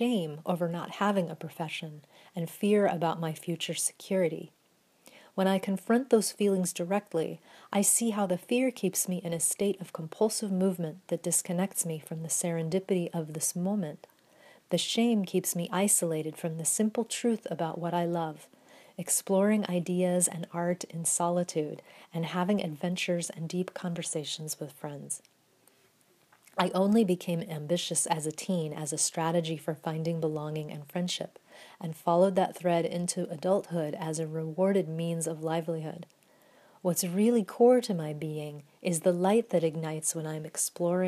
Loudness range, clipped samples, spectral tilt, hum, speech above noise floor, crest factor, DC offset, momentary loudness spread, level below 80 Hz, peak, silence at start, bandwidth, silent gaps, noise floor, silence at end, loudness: 4 LU; under 0.1%; -4.5 dB/octave; none; 36 dB; 20 dB; under 0.1%; 12 LU; -80 dBFS; -10 dBFS; 0 s; 15.5 kHz; none; -66 dBFS; 0 s; -30 LUFS